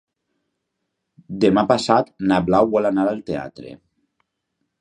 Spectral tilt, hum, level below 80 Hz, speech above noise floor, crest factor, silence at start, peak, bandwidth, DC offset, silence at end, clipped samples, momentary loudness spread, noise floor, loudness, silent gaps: -6.5 dB/octave; none; -52 dBFS; 59 dB; 20 dB; 1.3 s; 0 dBFS; 10.5 kHz; under 0.1%; 1.05 s; under 0.1%; 15 LU; -77 dBFS; -19 LUFS; none